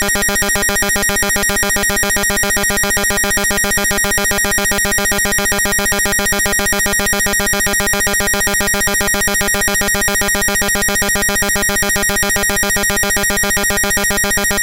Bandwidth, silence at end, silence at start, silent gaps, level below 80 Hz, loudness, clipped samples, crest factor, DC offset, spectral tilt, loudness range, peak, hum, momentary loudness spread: 17.5 kHz; 0 s; 0 s; none; -28 dBFS; -13 LUFS; under 0.1%; 12 dB; 0.6%; -1.5 dB/octave; 0 LU; -2 dBFS; none; 0 LU